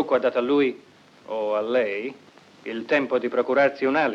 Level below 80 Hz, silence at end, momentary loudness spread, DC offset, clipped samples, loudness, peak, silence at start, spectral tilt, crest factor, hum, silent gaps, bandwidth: -76 dBFS; 0 s; 13 LU; under 0.1%; under 0.1%; -23 LUFS; -8 dBFS; 0 s; -6 dB/octave; 16 dB; none; none; 7.4 kHz